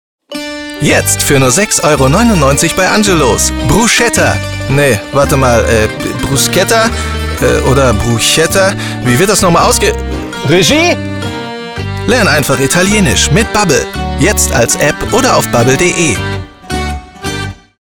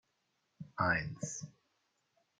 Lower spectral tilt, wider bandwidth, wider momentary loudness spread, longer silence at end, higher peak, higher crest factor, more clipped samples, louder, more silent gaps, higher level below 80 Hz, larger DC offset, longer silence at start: about the same, -4 dB/octave vs -4.5 dB/octave; first, over 20 kHz vs 9.6 kHz; second, 12 LU vs 20 LU; second, 0.35 s vs 0.9 s; first, 0 dBFS vs -18 dBFS; second, 10 dB vs 22 dB; neither; first, -9 LUFS vs -36 LUFS; neither; first, -24 dBFS vs -66 dBFS; first, 0.5% vs under 0.1%; second, 0.3 s vs 0.6 s